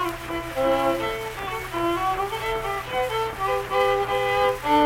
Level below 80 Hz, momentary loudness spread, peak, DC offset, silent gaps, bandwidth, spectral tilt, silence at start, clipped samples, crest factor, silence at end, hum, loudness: -44 dBFS; 7 LU; -8 dBFS; under 0.1%; none; 17.5 kHz; -4.5 dB/octave; 0 s; under 0.1%; 16 dB; 0 s; none; -24 LUFS